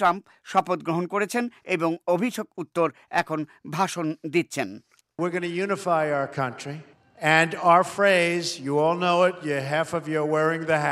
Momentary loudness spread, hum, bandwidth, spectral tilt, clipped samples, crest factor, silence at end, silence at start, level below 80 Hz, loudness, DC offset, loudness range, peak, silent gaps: 12 LU; none; 15 kHz; -5 dB/octave; under 0.1%; 22 dB; 0 s; 0 s; -70 dBFS; -24 LUFS; under 0.1%; 6 LU; -2 dBFS; none